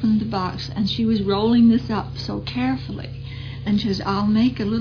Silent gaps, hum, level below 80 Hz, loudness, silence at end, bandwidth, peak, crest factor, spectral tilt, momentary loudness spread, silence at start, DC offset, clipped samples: none; none; -42 dBFS; -21 LUFS; 0 s; 5.4 kHz; -8 dBFS; 14 dB; -7.5 dB/octave; 15 LU; 0 s; under 0.1%; under 0.1%